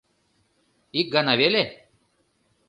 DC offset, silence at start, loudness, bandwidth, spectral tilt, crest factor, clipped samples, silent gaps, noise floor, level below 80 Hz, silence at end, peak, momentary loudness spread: under 0.1%; 0.95 s; -22 LUFS; 10.5 kHz; -6 dB/octave; 22 dB; under 0.1%; none; -68 dBFS; -68 dBFS; 0.95 s; -4 dBFS; 11 LU